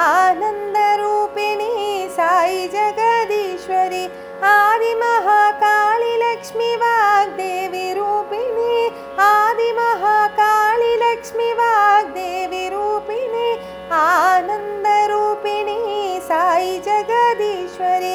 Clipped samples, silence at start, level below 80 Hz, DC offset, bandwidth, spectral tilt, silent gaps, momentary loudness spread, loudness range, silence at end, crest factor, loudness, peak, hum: under 0.1%; 0 s; -58 dBFS; under 0.1%; over 20 kHz; -2.5 dB/octave; none; 9 LU; 3 LU; 0 s; 16 dB; -17 LUFS; -2 dBFS; none